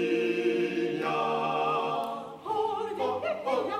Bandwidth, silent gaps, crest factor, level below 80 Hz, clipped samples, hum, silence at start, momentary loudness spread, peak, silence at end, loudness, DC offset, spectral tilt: 15 kHz; none; 14 dB; -74 dBFS; under 0.1%; none; 0 s; 5 LU; -16 dBFS; 0 s; -29 LUFS; under 0.1%; -5.5 dB/octave